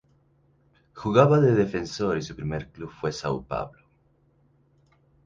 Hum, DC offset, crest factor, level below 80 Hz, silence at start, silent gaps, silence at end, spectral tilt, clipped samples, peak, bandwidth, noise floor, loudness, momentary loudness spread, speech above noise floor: none; under 0.1%; 22 dB; -52 dBFS; 0.95 s; none; 1.55 s; -7 dB/octave; under 0.1%; -4 dBFS; 7.6 kHz; -64 dBFS; -25 LUFS; 16 LU; 40 dB